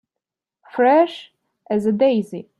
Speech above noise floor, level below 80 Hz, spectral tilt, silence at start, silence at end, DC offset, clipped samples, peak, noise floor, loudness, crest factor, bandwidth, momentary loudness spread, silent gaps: 68 dB; -68 dBFS; -7 dB/octave; 0.75 s; 0.2 s; under 0.1%; under 0.1%; -4 dBFS; -85 dBFS; -18 LUFS; 16 dB; 12 kHz; 13 LU; none